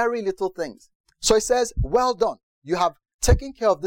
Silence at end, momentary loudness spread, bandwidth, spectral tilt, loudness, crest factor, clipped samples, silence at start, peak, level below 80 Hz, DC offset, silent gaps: 0 s; 9 LU; 17 kHz; -4.5 dB/octave; -23 LUFS; 16 dB; under 0.1%; 0 s; -6 dBFS; -32 dBFS; under 0.1%; 0.95-1.04 s, 2.43-2.62 s, 3.14-3.19 s